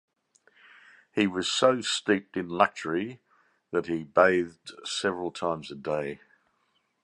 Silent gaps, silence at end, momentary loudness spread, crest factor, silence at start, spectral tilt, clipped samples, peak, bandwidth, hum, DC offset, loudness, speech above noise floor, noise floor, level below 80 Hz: none; 0.9 s; 12 LU; 24 dB; 1.15 s; -4 dB/octave; under 0.1%; -4 dBFS; 11.5 kHz; none; under 0.1%; -27 LUFS; 46 dB; -73 dBFS; -66 dBFS